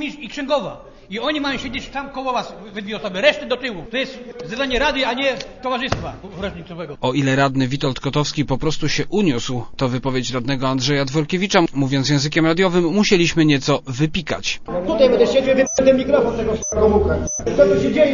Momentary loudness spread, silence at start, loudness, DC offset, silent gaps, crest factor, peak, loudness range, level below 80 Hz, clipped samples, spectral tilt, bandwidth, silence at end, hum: 12 LU; 0 s; -19 LUFS; under 0.1%; none; 18 dB; 0 dBFS; 6 LU; -38 dBFS; under 0.1%; -5 dB/octave; 7.4 kHz; 0 s; none